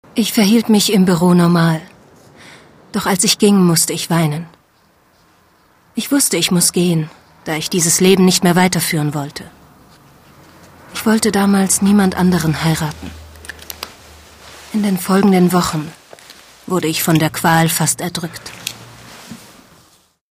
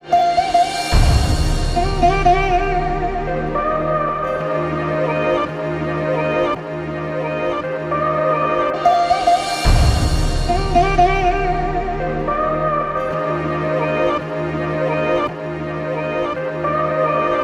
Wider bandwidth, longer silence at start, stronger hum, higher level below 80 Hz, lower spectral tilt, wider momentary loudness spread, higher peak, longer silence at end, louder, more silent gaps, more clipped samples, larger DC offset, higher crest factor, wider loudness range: about the same, 16 kHz vs 15 kHz; about the same, 0.15 s vs 0.05 s; neither; second, -48 dBFS vs -24 dBFS; second, -4.5 dB/octave vs -6 dB/octave; first, 18 LU vs 7 LU; about the same, 0 dBFS vs -2 dBFS; first, 0.95 s vs 0 s; first, -14 LUFS vs -18 LUFS; neither; neither; neither; about the same, 16 dB vs 16 dB; about the same, 4 LU vs 4 LU